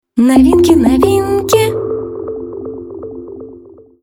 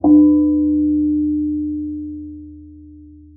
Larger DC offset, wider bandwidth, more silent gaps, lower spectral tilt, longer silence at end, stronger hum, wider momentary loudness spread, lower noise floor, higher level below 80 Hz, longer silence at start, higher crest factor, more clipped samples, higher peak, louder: neither; first, 18.5 kHz vs 1.1 kHz; neither; second, -6 dB/octave vs -17 dB/octave; first, 0.45 s vs 0.3 s; neither; about the same, 20 LU vs 20 LU; about the same, -38 dBFS vs -41 dBFS; first, -34 dBFS vs -44 dBFS; about the same, 0.15 s vs 0.05 s; about the same, 12 dB vs 14 dB; neither; first, 0 dBFS vs -4 dBFS; first, -11 LUFS vs -16 LUFS